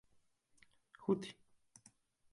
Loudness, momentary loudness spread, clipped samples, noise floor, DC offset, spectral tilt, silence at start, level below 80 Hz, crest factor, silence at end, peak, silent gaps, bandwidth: -41 LUFS; 25 LU; under 0.1%; -74 dBFS; under 0.1%; -6.5 dB/octave; 1 s; -82 dBFS; 24 dB; 1 s; -22 dBFS; none; 11.5 kHz